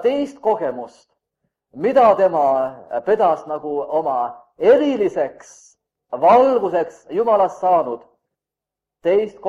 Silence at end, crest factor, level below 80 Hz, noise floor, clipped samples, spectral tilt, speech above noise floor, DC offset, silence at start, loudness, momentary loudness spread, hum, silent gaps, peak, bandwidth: 0 s; 18 dB; -62 dBFS; -86 dBFS; under 0.1%; -6 dB/octave; 69 dB; under 0.1%; 0 s; -18 LUFS; 12 LU; none; none; -2 dBFS; 10 kHz